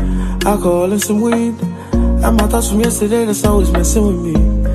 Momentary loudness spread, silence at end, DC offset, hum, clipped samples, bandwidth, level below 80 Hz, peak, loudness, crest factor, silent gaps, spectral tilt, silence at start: 4 LU; 0 s; under 0.1%; none; under 0.1%; 13.5 kHz; -18 dBFS; -2 dBFS; -14 LUFS; 12 dB; none; -5.5 dB/octave; 0 s